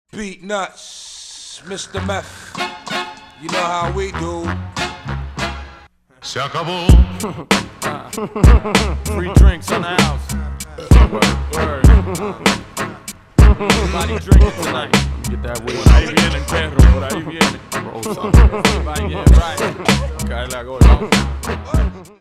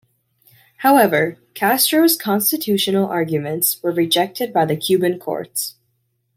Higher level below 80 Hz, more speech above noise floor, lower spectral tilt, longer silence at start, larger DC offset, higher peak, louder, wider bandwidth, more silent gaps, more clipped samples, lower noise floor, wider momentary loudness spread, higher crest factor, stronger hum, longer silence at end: first, -18 dBFS vs -66 dBFS; second, 30 dB vs 51 dB; first, -5.5 dB/octave vs -3.5 dB/octave; second, 0.15 s vs 0.8 s; neither; about the same, 0 dBFS vs -2 dBFS; about the same, -16 LUFS vs -17 LUFS; second, 14 kHz vs 16.5 kHz; neither; neither; second, -45 dBFS vs -68 dBFS; first, 14 LU vs 10 LU; about the same, 14 dB vs 18 dB; neither; second, 0.15 s vs 0.65 s